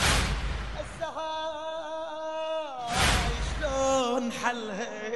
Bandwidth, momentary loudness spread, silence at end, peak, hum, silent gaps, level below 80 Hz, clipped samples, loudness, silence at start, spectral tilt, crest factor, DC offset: 12 kHz; 11 LU; 0 s; -10 dBFS; none; none; -36 dBFS; under 0.1%; -30 LUFS; 0 s; -3.5 dB/octave; 20 dB; 0.3%